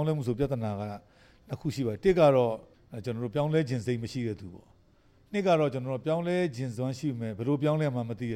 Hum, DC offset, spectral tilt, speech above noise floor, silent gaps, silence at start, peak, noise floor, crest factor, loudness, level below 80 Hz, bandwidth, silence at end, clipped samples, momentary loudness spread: none; under 0.1%; -7.5 dB/octave; 33 dB; none; 0 s; -10 dBFS; -62 dBFS; 18 dB; -29 LUFS; -56 dBFS; 14 kHz; 0 s; under 0.1%; 15 LU